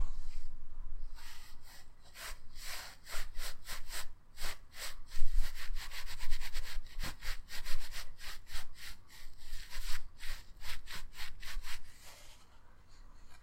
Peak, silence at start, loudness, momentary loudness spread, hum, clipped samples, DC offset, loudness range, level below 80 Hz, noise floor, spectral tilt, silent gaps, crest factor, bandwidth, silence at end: -12 dBFS; 0 s; -47 LUFS; 13 LU; none; under 0.1%; under 0.1%; 4 LU; -38 dBFS; -54 dBFS; -2 dB/octave; none; 18 dB; 15.5 kHz; 0 s